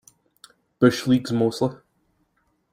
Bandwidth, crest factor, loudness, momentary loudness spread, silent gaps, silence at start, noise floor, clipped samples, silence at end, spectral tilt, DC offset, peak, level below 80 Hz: 15 kHz; 22 dB; -22 LUFS; 8 LU; none; 0.8 s; -69 dBFS; under 0.1%; 1 s; -6.5 dB/octave; under 0.1%; -4 dBFS; -62 dBFS